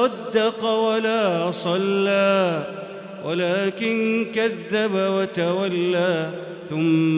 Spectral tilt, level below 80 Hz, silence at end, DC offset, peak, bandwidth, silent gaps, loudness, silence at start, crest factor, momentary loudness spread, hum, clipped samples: -10 dB/octave; -70 dBFS; 0 s; under 0.1%; -8 dBFS; 4 kHz; none; -22 LUFS; 0 s; 14 dB; 9 LU; none; under 0.1%